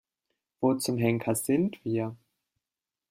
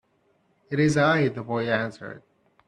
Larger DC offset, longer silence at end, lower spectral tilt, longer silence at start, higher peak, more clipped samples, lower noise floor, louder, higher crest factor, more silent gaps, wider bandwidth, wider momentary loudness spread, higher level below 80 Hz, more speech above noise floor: neither; first, 0.95 s vs 0.5 s; about the same, -5.5 dB/octave vs -6 dB/octave; about the same, 0.6 s vs 0.7 s; about the same, -10 dBFS vs -8 dBFS; neither; first, under -90 dBFS vs -67 dBFS; second, -28 LUFS vs -24 LUFS; about the same, 20 dB vs 18 dB; neither; first, 16 kHz vs 11 kHz; second, 5 LU vs 16 LU; second, -68 dBFS vs -62 dBFS; first, over 63 dB vs 43 dB